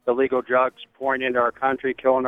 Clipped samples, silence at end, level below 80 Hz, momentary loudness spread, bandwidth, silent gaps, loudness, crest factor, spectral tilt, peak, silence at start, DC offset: under 0.1%; 0 s; -62 dBFS; 5 LU; 3.9 kHz; none; -22 LUFS; 16 dB; -7 dB/octave; -6 dBFS; 0.05 s; under 0.1%